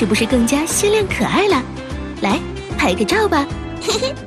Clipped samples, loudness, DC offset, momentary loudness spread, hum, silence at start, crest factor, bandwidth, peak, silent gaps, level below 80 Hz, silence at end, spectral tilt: under 0.1%; -17 LUFS; under 0.1%; 10 LU; none; 0 s; 14 dB; 13.5 kHz; -4 dBFS; none; -34 dBFS; 0 s; -4 dB/octave